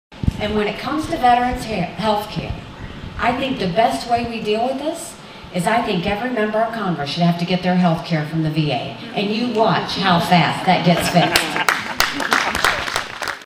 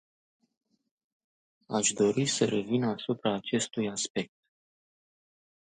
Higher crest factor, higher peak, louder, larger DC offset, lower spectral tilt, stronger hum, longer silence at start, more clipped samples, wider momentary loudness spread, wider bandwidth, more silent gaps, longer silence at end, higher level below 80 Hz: about the same, 18 dB vs 22 dB; first, 0 dBFS vs -12 dBFS; first, -19 LUFS vs -29 LUFS; neither; about the same, -5 dB/octave vs -4 dB/octave; neither; second, 0.1 s vs 1.7 s; neither; about the same, 10 LU vs 8 LU; first, 16 kHz vs 9.8 kHz; second, none vs 4.10-4.15 s; second, 0 s vs 1.5 s; first, -40 dBFS vs -72 dBFS